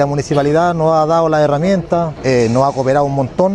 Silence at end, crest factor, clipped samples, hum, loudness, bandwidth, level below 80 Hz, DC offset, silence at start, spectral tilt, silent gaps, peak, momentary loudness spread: 0 s; 12 dB; under 0.1%; none; -14 LUFS; 11 kHz; -40 dBFS; under 0.1%; 0 s; -7 dB/octave; none; 0 dBFS; 3 LU